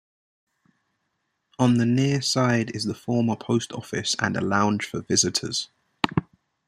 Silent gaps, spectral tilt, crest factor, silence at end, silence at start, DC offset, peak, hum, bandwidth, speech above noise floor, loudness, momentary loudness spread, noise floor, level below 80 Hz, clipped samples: none; -4.5 dB/octave; 24 dB; 0.45 s; 1.6 s; under 0.1%; -2 dBFS; none; 13 kHz; 53 dB; -24 LUFS; 8 LU; -76 dBFS; -60 dBFS; under 0.1%